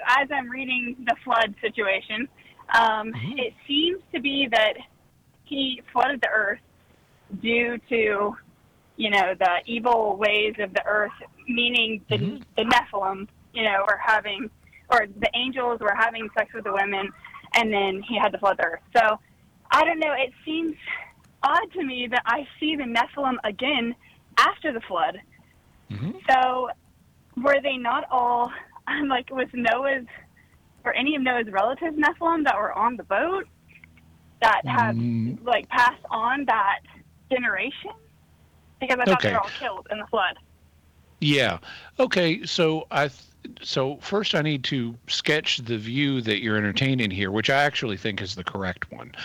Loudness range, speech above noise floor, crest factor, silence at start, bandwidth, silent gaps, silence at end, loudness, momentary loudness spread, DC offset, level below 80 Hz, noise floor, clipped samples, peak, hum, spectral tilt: 3 LU; 35 dB; 16 dB; 0 s; 19.5 kHz; none; 0 s; -24 LUFS; 10 LU; under 0.1%; -58 dBFS; -59 dBFS; under 0.1%; -10 dBFS; none; -5 dB/octave